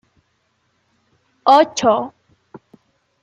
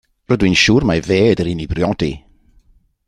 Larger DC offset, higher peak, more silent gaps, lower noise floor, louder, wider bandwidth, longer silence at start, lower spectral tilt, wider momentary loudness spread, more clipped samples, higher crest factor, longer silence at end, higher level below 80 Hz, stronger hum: neither; about the same, -2 dBFS vs 0 dBFS; neither; first, -66 dBFS vs -53 dBFS; about the same, -15 LUFS vs -15 LUFS; second, 10 kHz vs 12 kHz; first, 1.45 s vs 0.3 s; second, -3.5 dB/octave vs -5.5 dB/octave; about the same, 10 LU vs 10 LU; neither; about the same, 18 dB vs 16 dB; first, 1.15 s vs 0.9 s; second, -68 dBFS vs -36 dBFS; neither